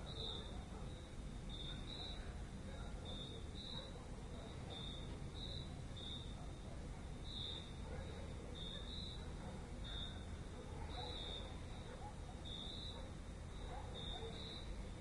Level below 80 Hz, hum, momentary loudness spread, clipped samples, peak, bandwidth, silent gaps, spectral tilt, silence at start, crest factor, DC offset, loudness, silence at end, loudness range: -54 dBFS; none; 5 LU; under 0.1%; -34 dBFS; 11.5 kHz; none; -5 dB/octave; 0 s; 14 dB; under 0.1%; -50 LUFS; 0 s; 1 LU